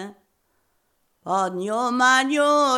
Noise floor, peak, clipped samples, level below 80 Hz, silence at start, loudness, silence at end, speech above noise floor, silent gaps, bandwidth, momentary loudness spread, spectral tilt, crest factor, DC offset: -69 dBFS; -6 dBFS; under 0.1%; -78 dBFS; 0 s; -20 LUFS; 0 s; 49 dB; none; 16 kHz; 16 LU; -3 dB/octave; 16 dB; under 0.1%